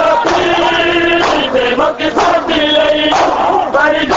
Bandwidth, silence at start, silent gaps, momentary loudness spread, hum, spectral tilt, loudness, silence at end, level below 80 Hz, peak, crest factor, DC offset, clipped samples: 8 kHz; 0 s; none; 3 LU; none; -3.5 dB/octave; -11 LUFS; 0 s; -38 dBFS; 0 dBFS; 12 dB; under 0.1%; under 0.1%